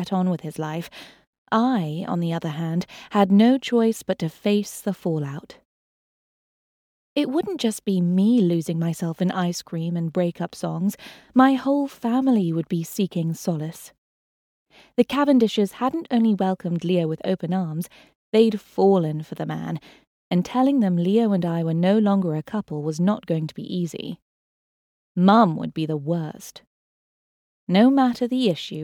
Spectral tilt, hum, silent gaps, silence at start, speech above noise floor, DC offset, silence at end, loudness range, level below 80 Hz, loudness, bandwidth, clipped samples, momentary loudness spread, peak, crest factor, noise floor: -7 dB/octave; none; 1.27-1.46 s, 5.65-7.16 s, 13.98-14.66 s, 18.15-18.32 s, 20.07-20.31 s, 24.22-25.15 s, 26.67-27.67 s; 0 s; over 68 dB; under 0.1%; 0 s; 4 LU; -66 dBFS; -22 LUFS; 17 kHz; under 0.1%; 12 LU; -4 dBFS; 18 dB; under -90 dBFS